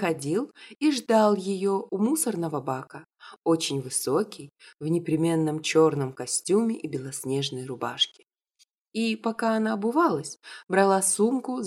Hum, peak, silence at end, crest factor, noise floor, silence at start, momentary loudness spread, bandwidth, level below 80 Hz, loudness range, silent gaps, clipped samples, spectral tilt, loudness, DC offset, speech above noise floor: none; -10 dBFS; 0 s; 16 dB; -67 dBFS; 0 s; 11 LU; 16 kHz; -74 dBFS; 3 LU; 8.81-8.85 s; under 0.1%; -4.5 dB/octave; -26 LUFS; under 0.1%; 41 dB